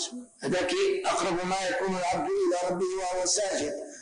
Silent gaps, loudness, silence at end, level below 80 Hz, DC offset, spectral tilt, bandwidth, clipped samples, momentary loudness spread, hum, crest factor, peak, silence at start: none; -28 LUFS; 0 s; -60 dBFS; under 0.1%; -3 dB/octave; 10 kHz; under 0.1%; 5 LU; none; 12 dB; -16 dBFS; 0 s